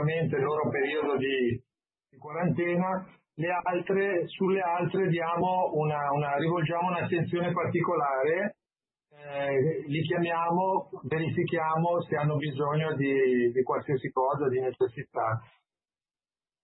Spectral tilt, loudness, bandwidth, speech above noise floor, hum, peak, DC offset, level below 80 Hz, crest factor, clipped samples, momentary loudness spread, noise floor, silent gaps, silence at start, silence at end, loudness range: -11 dB/octave; -28 LUFS; 4.1 kHz; over 62 dB; none; -16 dBFS; under 0.1%; -68 dBFS; 14 dB; under 0.1%; 5 LU; under -90 dBFS; none; 0 s; 1.2 s; 2 LU